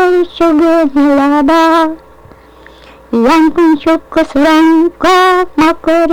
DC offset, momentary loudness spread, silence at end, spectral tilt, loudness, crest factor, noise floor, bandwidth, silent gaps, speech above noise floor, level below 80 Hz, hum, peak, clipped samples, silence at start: under 0.1%; 5 LU; 0 s; -4.5 dB/octave; -9 LUFS; 6 dB; -38 dBFS; 16 kHz; none; 29 dB; -38 dBFS; none; -4 dBFS; under 0.1%; 0 s